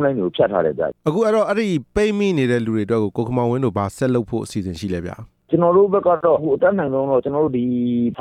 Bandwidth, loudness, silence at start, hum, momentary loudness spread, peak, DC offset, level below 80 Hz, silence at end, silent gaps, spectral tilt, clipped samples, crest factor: 13.5 kHz; -19 LUFS; 0 s; none; 9 LU; -4 dBFS; under 0.1%; -48 dBFS; 0 s; none; -7.5 dB/octave; under 0.1%; 14 dB